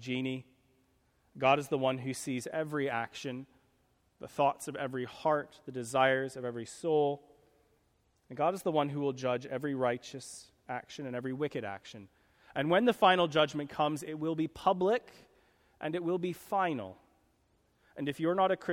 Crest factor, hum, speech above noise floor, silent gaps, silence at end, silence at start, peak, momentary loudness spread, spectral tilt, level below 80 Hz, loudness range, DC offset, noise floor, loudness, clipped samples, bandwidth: 22 dB; none; 40 dB; none; 0 s; 0 s; -10 dBFS; 15 LU; -5 dB/octave; -72 dBFS; 6 LU; under 0.1%; -73 dBFS; -33 LUFS; under 0.1%; 17 kHz